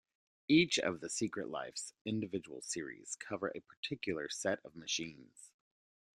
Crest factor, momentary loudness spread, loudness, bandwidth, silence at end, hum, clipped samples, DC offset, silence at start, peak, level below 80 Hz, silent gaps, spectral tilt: 22 dB; 14 LU; -38 LUFS; 12 kHz; 0.7 s; none; under 0.1%; under 0.1%; 0.5 s; -18 dBFS; -76 dBFS; 2.01-2.05 s, 3.77-3.83 s; -3.5 dB/octave